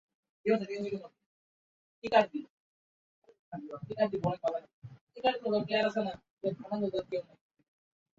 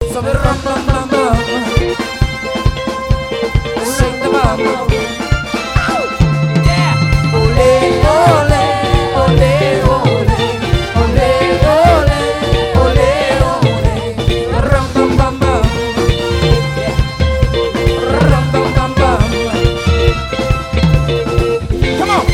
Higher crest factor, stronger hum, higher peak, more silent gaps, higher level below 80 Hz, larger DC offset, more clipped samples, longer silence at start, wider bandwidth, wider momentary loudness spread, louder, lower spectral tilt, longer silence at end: first, 24 dB vs 12 dB; neither; second, -12 dBFS vs 0 dBFS; first, 1.26-2.02 s, 2.50-3.22 s, 3.39-3.52 s, 4.73-4.82 s, 5.01-5.07 s, 6.30-6.37 s vs none; second, -72 dBFS vs -20 dBFS; neither; second, under 0.1% vs 0.3%; first, 0.45 s vs 0 s; second, 7.8 kHz vs 16 kHz; first, 16 LU vs 6 LU; second, -33 LUFS vs -13 LUFS; about the same, -6.5 dB/octave vs -6 dB/octave; first, 0.95 s vs 0 s